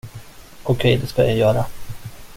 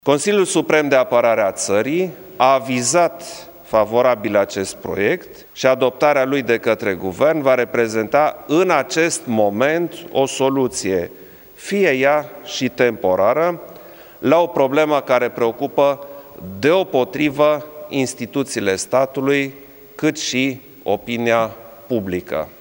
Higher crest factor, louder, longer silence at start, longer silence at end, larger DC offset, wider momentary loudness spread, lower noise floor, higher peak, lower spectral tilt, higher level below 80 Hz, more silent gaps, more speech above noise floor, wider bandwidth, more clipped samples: about the same, 18 dB vs 18 dB; about the same, -19 LUFS vs -18 LUFS; about the same, 0.05 s vs 0.05 s; about the same, 0 s vs 0.1 s; neither; first, 20 LU vs 9 LU; about the same, -39 dBFS vs -40 dBFS; about the same, -2 dBFS vs 0 dBFS; first, -6.5 dB/octave vs -4 dB/octave; first, -40 dBFS vs -58 dBFS; neither; about the same, 22 dB vs 22 dB; about the same, 16.5 kHz vs 17 kHz; neither